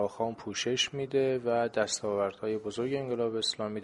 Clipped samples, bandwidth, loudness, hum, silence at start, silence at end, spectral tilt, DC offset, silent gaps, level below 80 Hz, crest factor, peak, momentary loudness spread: under 0.1%; 11.5 kHz; -31 LUFS; none; 0 s; 0 s; -3.5 dB/octave; under 0.1%; none; -68 dBFS; 18 dB; -14 dBFS; 5 LU